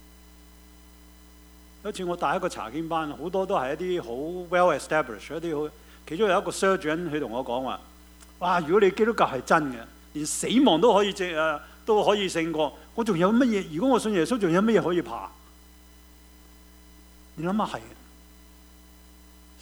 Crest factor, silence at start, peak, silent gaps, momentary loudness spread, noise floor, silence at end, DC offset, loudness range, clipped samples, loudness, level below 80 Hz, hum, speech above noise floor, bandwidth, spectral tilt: 20 dB; 1.85 s; -6 dBFS; none; 12 LU; -51 dBFS; 1.7 s; under 0.1%; 11 LU; under 0.1%; -25 LUFS; -52 dBFS; none; 27 dB; over 20 kHz; -5 dB/octave